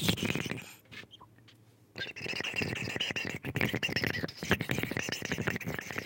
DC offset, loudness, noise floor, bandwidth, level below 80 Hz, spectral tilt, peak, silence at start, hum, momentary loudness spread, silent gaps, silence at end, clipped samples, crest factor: under 0.1%; -34 LUFS; -60 dBFS; 17 kHz; -60 dBFS; -4 dB/octave; -8 dBFS; 0 s; none; 16 LU; none; 0 s; under 0.1%; 28 dB